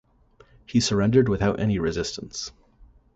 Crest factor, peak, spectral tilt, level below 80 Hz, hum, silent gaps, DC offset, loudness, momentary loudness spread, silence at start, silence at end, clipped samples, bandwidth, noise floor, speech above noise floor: 18 dB; -6 dBFS; -5.5 dB/octave; -44 dBFS; none; none; under 0.1%; -24 LUFS; 14 LU; 0.7 s; 0.3 s; under 0.1%; 8.2 kHz; -57 dBFS; 34 dB